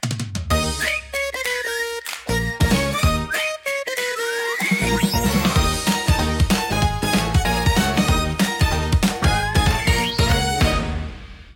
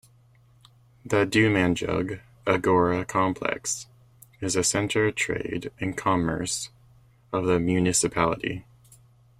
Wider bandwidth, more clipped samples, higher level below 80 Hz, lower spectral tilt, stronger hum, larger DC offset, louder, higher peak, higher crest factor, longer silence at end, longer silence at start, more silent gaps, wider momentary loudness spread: about the same, 17 kHz vs 16 kHz; neither; first, -28 dBFS vs -54 dBFS; about the same, -4.5 dB/octave vs -4.5 dB/octave; neither; neither; first, -20 LUFS vs -25 LUFS; about the same, -4 dBFS vs -6 dBFS; about the same, 16 dB vs 20 dB; second, 0 s vs 0.8 s; second, 0 s vs 1.05 s; neither; second, 6 LU vs 11 LU